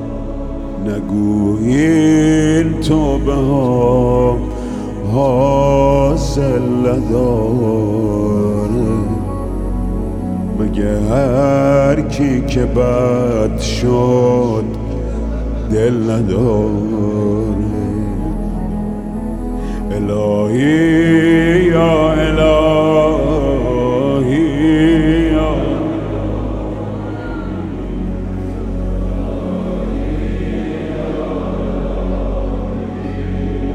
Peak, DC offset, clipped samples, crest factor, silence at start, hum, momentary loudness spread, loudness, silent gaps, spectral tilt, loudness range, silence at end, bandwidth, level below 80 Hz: 0 dBFS; 0.2%; under 0.1%; 14 dB; 0 s; none; 11 LU; -15 LUFS; none; -7.5 dB/octave; 8 LU; 0 s; 12 kHz; -24 dBFS